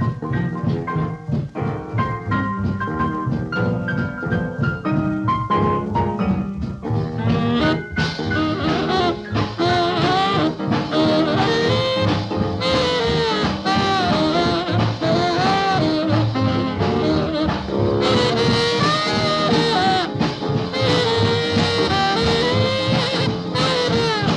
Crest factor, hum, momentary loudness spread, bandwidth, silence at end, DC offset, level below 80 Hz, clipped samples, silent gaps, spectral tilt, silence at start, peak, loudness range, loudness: 14 dB; none; 6 LU; 10.5 kHz; 0 s; under 0.1%; -42 dBFS; under 0.1%; none; -6 dB/octave; 0 s; -4 dBFS; 4 LU; -19 LUFS